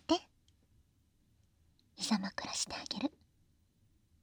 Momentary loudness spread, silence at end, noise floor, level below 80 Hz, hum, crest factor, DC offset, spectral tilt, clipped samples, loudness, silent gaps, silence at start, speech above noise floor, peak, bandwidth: 5 LU; 1.15 s; -72 dBFS; -72 dBFS; none; 24 dB; under 0.1%; -3 dB/octave; under 0.1%; -37 LUFS; none; 0.1 s; 34 dB; -16 dBFS; 19 kHz